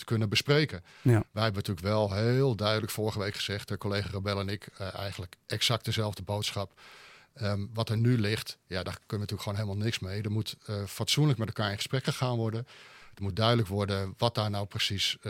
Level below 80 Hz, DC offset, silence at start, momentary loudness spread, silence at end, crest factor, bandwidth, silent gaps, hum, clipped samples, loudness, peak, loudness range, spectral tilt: -64 dBFS; under 0.1%; 0 s; 10 LU; 0 s; 22 dB; 16.5 kHz; none; none; under 0.1%; -30 LUFS; -8 dBFS; 4 LU; -5 dB/octave